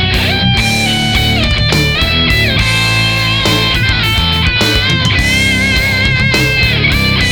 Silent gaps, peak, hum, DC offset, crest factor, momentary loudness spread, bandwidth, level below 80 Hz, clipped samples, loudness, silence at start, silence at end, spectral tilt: none; 0 dBFS; none; 0.7%; 10 dB; 1 LU; 19 kHz; -22 dBFS; under 0.1%; -10 LUFS; 0 s; 0 s; -4 dB/octave